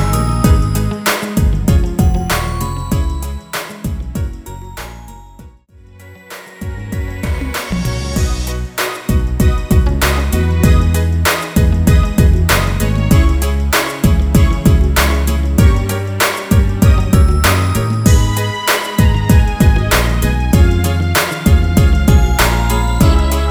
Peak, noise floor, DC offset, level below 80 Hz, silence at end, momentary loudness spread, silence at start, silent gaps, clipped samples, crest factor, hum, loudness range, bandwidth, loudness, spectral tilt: 0 dBFS; -41 dBFS; under 0.1%; -16 dBFS; 0 s; 11 LU; 0 s; none; under 0.1%; 12 dB; none; 11 LU; over 20 kHz; -14 LUFS; -5.5 dB/octave